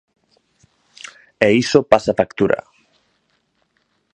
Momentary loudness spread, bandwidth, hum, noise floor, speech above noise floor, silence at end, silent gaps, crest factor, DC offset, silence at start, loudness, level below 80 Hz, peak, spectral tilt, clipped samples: 23 LU; 9.8 kHz; none; -66 dBFS; 51 dB; 1.55 s; none; 20 dB; under 0.1%; 1.4 s; -16 LUFS; -52 dBFS; 0 dBFS; -5.5 dB/octave; under 0.1%